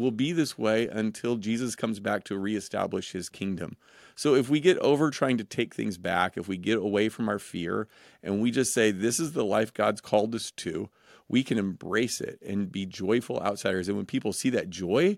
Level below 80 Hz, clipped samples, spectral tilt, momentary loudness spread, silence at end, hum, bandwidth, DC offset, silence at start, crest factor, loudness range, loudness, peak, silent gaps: -66 dBFS; under 0.1%; -4.5 dB/octave; 9 LU; 0 s; none; 16.5 kHz; under 0.1%; 0 s; 20 dB; 3 LU; -28 LUFS; -8 dBFS; none